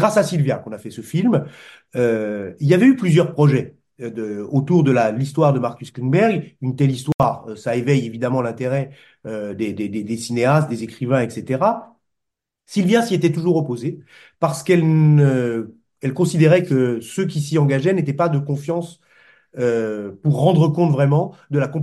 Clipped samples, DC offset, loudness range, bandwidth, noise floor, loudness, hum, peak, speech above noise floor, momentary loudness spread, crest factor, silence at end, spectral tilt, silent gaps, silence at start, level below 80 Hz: under 0.1%; under 0.1%; 4 LU; 12.5 kHz; -82 dBFS; -19 LUFS; none; -2 dBFS; 64 dB; 13 LU; 18 dB; 0 s; -7.5 dB/octave; 7.14-7.19 s; 0 s; -58 dBFS